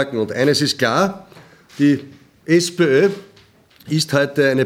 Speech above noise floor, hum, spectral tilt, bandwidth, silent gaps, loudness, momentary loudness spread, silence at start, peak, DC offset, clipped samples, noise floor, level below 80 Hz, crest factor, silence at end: 34 dB; none; -5 dB/octave; 16.5 kHz; none; -17 LUFS; 8 LU; 0 s; -2 dBFS; under 0.1%; under 0.1%; -50 dBFS; -62 dBFS; 16 dB; 0 s